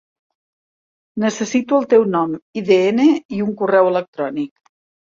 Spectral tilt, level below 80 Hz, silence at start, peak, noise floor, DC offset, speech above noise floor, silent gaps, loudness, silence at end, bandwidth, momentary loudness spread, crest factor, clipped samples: -5.5 dB/octave; -64 dBFS; 1.15 s; -2 dBFS; under -90 dBFS; under 0.1%; over 74 dB; 2.42-2.53 s, 3.25-3.29 s, 4.08-4.13 s; -17 LUFS; 0.65 s; 7.6 kHz; 11 LU; 16 dB; under 0.1%